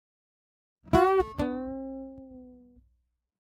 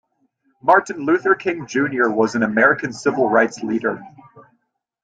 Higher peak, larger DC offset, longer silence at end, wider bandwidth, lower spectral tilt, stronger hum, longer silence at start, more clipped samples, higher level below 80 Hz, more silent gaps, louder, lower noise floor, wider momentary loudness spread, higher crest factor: second, -8 dBFS vs -2 dBFS; neither; first, 1.05 s vs 0.65 s; first, 16 kHz vs 9.2 kHz; first, -7 dB/octave vs -5.5 dB/octave; neither; first, 0.85 s vs 0.65 s; neither; first, -48 dBFS vs -64 dBFS; neither; second, -27 LUFS vs -18 LUFS; first, -74 dBFS vs -68 dBFS; first, 23 LU vs 7 LU; first, 24 dB vs 18 dB